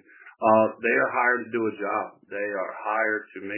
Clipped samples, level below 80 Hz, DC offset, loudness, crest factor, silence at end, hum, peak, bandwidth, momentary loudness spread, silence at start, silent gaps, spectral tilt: under 0.1%; -76 dBFS; under 0.1%; -25 LUFS; 20 dB; 0 s; none; -6 dBFS; 3.2 kHz; 10 LU; 0.2 s; none; -9.5 dB/octave